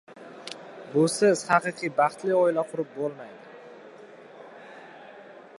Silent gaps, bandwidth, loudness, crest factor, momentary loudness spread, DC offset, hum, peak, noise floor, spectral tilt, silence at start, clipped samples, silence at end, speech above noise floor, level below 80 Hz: none; 11.5 kHz; -25 LUFS; 22 dB; 25 LU; under 0.1%; none; -6 dBFS; -47 dBFS; -4.5 dB/octave; 0.1 s; under 0.1%; 0.3 s; 23 dB; -78 dBFS